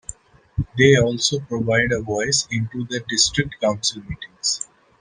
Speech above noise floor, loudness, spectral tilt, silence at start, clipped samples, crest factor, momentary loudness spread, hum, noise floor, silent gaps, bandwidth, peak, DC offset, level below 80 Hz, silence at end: 20 dB; -20 LUFS; -3.5 dB/octave; 0.1 s; under 0.1%; 20 dB; 15 LU; none; -40 dBFS; none; 10.5 kHz; -2 dBFS; under 0.1%; -44 dBFS; 0.35 s